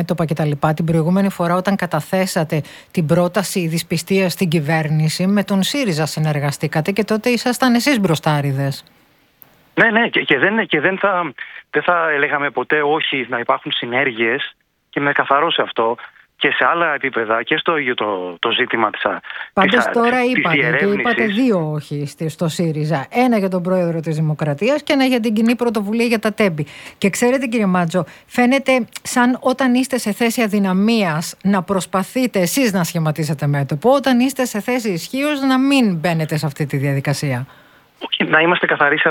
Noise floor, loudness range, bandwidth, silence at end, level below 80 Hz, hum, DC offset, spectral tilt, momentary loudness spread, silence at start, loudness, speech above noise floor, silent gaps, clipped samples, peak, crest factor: -50 dBFS; 2 LU; 18.5 kHz; 0 s; -56 dBFS; none; under 0.1%; -5 dB/octave; 7 LU; 0 s; -17 LUFS; 33 dB; none; under 0.1%; 0 dBFS; 16 dB